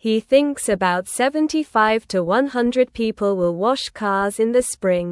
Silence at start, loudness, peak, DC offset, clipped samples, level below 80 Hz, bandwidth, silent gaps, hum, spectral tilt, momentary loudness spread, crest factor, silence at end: 0.05 s; -19 LUFS; -4 dBFS; under 0.1%; under 0.1%; -52 dBFS; 12 kHz; none; none; -4.5 dB/octave; 4 LU; 16 dB; 0 s